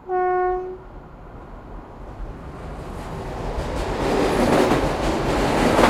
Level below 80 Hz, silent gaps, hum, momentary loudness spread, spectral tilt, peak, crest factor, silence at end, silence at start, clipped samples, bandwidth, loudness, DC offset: -34 dBFS; none; none; 22 LU; -5.5 dB/octave; -2 dBFS; 20 dB; 0 s; 0 s; under 0.1%; 16 kHz; -22 LUFS; under 0.1%